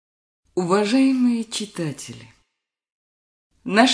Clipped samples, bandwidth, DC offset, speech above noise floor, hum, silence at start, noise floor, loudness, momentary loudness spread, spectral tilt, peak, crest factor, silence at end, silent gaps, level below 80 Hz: under 0.1%; 11 kHz; under 0.1%; 59 dB; none; 0.55 s; -79 dBFS; -21 LUFS; 17 LU; -4.5 dB/octave; -2 dBFS; 20 dB; 0 s; 2.92-3.50 s; -66 dBFS